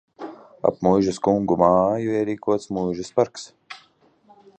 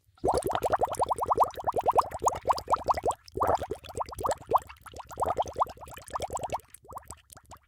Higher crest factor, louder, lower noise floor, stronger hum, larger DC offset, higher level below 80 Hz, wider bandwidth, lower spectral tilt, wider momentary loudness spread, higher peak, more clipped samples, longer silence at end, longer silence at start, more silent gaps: about the same, 20 dB vs 20 dB; first, -21 LUFS vs -30 LUFS; first, -58 dBFS vs -53 dBFS; neither; neither; about the same, -54 dBFS vs -52 dBFS; second, 9 kHz vs 18 kHz; first, -7 dB/octave vs -4.5 dB/octave; first, 21 LU vs 18 LU; first, -2 dBFS vs -10 dBFS; neither; first, 0.85 s vs 0.1 s; about the same, 0.2 s vs 0.25 s; neither